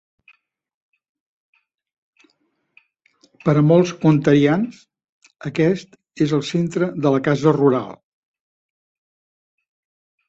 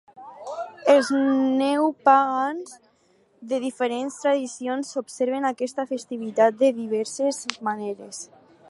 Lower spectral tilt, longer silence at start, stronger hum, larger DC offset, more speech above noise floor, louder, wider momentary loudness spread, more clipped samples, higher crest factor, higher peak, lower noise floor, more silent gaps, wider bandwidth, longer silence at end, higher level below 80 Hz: first, -7.5 dB/octave vs -3.5 dB/octave; first, 3.45 s vs 0.15 s; neither; neither; first, 51 dB vs 39 dB; first, -18 LUFS vs -23 LUFS; second, 12 LU vs 16 LU; neither; about the same, 18 dB vs 22 dB; about the same, -2 dBFS vs -2 dBFS; first, -68 dBFS vs -62 dBFS; first, 5.09-5.21 s vs none; second, 8 kHz vs 11.5 kHz; first, 2.35 s vs 0.45 s; first, -60 dBFS vs -80 dBFS